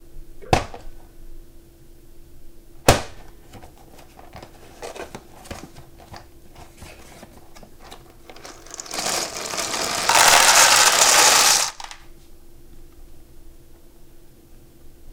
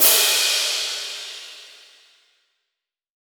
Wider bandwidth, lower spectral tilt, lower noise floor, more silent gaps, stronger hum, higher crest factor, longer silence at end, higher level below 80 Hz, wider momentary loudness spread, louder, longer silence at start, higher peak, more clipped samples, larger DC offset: second, 18 kHz vs over 20 kHz; first, -0.5 dB/octave vs 3.5 dB/octave; second, -46 dBFS vs -83 dBFS; neither; neither; about the same, 22 dB vs 24 dB; second, 0.05 s vs 1.65 s; first, -42 dBFS vs -78 dBFS; first, 28 LU vs 23 LU; first, -15 LUFS vs -18 LUFS; first, 0.15 s vs 0 s; about the same, 0 dBFS vs 0 dBFS; neither; neither